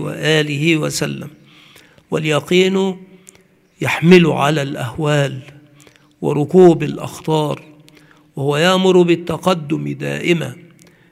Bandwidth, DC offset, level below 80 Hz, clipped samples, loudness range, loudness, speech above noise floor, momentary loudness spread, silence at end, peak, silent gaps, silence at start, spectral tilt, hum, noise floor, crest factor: 15 kHz; under 0.1%; -56 dBFS; under 0.1%; 3 LU; -16 LUFS; 37 dB; 14 LU; 0.5 s; 0 dBFS; none; 0 s; -6 dB/octave; none; -52 dBFS; 16 dB